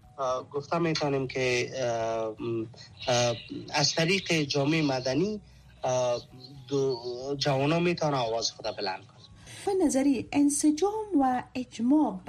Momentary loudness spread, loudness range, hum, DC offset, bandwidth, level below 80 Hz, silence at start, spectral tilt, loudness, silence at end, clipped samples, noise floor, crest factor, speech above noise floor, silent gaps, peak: 10 LU; 2 LU; none; under 0.1%; 13 kHz; -60 dBFS; 0.2 s; -4.5 dB/octave; -28 LUFS; 0 s; under 0.1%; -48 dBFS; 16 dB; 20 dB; none; -12 dBFS